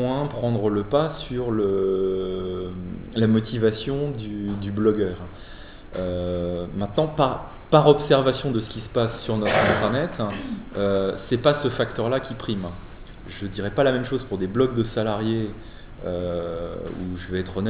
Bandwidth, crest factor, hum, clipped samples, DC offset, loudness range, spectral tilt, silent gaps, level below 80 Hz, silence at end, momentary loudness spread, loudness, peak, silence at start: 4 kHz; 22 dB; none; under 0.1%; under 0.1%; 5 LU; -11 dB/octave; none; -42 dBFS; 0 s; 13 LU; -24 LUFS; -2 dBFS; 0 s